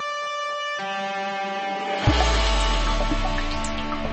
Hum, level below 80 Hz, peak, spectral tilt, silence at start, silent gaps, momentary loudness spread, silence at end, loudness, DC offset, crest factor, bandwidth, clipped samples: none; -28 dBFS; -6 dBFS; -4 dB/octave; 0 s; none; 7 LU; 0 s; -25 LUFS; under 0.1%; 18 dB; 8.8 kHz; under 0.1%